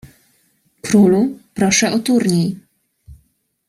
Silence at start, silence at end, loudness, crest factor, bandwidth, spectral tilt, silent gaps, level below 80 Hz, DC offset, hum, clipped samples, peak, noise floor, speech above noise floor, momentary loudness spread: 0.85 s; 0.55 s; -15 LUFS; 16 dB; 14.5 kHz; -4.5 dB/octave; none; -52 dBFS; under 0.1%; none; under 0.1%; -2 dBFS; -62 dBFS; 48 dB; 11 LU